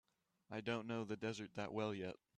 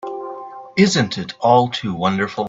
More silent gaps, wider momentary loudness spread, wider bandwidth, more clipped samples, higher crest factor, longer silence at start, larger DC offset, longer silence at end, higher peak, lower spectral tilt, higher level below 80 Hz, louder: neither; second, 5 LU vs 15 LU; first, 9.8 kHz vs 7.8 kHz; neither; about the same, 16 dB vs 18 dB; first, 0.5 s vs 0.05 s; neither; first, 0.2 s vs 0 s; second, -30 dBFS vs 0 dBFS; about the same, -6 dB/octave vs -5 dB/octave; second, -80 dBFS vs -56 dBFS; second, -45 LUFS vs -18 LUFS